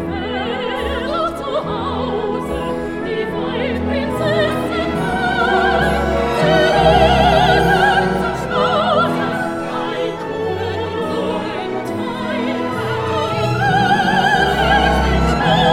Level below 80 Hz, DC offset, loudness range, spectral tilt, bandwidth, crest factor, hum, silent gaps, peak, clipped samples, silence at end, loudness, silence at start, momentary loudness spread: -30 dBFS; under 0.1%; 7 LU; -5.5 dB/octave; 16.5 kHz; 16 dB; none; none; 0 dBFS; under 0.1%; 0 s; -17 LUFS; 0 s; 9 LU